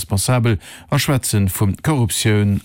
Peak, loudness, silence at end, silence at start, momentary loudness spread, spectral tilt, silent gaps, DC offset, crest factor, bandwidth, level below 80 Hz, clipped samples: -6 dBFS; -18 LUFS; 0.05 s; 0 s; 4 LU; -5 dB/octave; none; under 0.1%; 12 dB; 17 kHz; -40 dBFS; under 0.1%